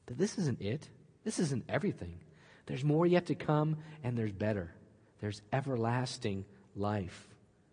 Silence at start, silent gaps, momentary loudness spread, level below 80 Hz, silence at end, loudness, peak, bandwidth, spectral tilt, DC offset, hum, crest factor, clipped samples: 0.05 s; none; 15 LU; -68 dBFS; 0.4 s; -35 LUFS; -16 dBFS; 10.5 kHz; -6.5 dB/octave; under 0.1%; none; 20 dB; under 0.1%